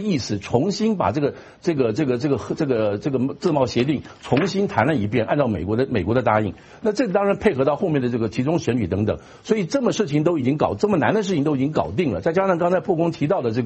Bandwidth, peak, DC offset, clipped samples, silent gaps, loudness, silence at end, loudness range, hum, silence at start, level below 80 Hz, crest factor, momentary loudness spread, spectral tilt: 8.4 kHz; -2 dBFS; under 0.1%; under 0.1%; none; -21 LUFS; 0 s; 1 LU; none; 0 s; -50 dBFS; 18 dB; 4 LU; -7 dB/octave